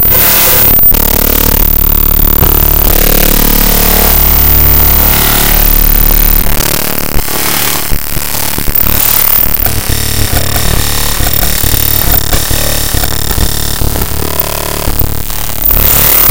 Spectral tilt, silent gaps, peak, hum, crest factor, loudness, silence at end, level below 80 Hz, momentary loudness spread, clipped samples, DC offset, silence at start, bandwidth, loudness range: -3 dB/octave; none; 0 dBFS; none; 8 dB; -7 LUFS; 0 s; -14 dBFS; 9 LU; 2%; 20%; 0 s; over 20 kHz; 5 LU